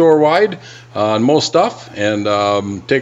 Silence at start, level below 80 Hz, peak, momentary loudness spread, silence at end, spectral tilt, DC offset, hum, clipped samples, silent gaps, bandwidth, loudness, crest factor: 0 s; -58 dBFS; 0 dBFS; 8 LU; 0 s; -5 dB/octave; under 0.1%; none; under 0.1%; none; 8.2 kHz; -15 LUFS; 14 dB